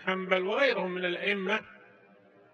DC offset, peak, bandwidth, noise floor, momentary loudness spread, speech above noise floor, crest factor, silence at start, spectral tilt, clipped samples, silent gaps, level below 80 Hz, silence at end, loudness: under 0.1%; -10 dBFS; 8.6 kHz; -59 dBFS; 5 LU; 29 dB; 20 dB; 0 s; -5.5 dB/octave; under 0.1%; none; -84 dBFS; 0.8 s; -29 LUFS